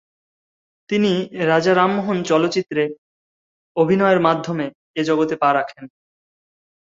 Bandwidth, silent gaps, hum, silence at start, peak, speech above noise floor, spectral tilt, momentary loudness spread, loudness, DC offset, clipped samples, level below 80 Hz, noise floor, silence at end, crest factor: 7.8 kHz; 2.98-3.75 s, 4.75-4.94 s; none; 0.9 s; -2 dBFS; over 72 dB; -6 dB/octave; 10 LU; -19 LUFS; under 0.1%; under 0.1%; -62 dBFS; under -90 dBFS; 0.95 s; 18 dB